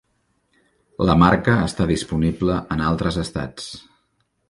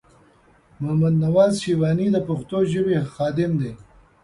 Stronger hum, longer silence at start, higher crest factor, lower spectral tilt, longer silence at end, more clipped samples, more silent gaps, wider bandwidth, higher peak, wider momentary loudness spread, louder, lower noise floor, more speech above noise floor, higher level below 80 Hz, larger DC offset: neither; first, 1 s vs 0.8 s; about the same, 20 dB vs 16 dB; about the same, -6.5 dB/octave vs -7.5 dB/octave; first, 0.7 s vs 0.4 s; neither; neither; about the same, 11.5 kHz vs 11.5 kHz; first, 0 dBFS vs -6 dBFS; first, 18 LU vs 8 LU; about the same, -20 LUFS vs -21 LUFS; first, -69 dBFS vs -55 dBFS; first, 49 dB vs 35 dB; first, -36 dBFS vs -52 dBFS; neither